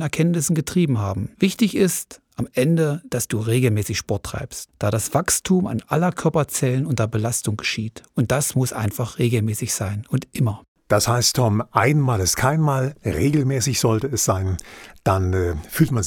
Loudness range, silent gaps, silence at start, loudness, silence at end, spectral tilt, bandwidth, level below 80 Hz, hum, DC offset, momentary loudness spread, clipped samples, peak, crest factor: 3 LU; 10.68-10.75 s; 0 s; -21 LUFS; 0 s; -5 dB/octave; 19.5 kHz; -44 dBFS; none; under 0.1%; 8 LU; under 0.1%; -2 dBFS; 20 dB